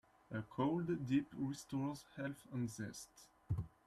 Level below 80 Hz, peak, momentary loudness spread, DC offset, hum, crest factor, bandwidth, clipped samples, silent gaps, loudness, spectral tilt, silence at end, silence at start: -64 dBFS; -26 dBFS; 11 LU; under 0.1%; none; 18 dB; 13.5 kHz; under 0.1%; none; -43 LUFS; -6.5 dB/octave; 0.2 s; 0.3 s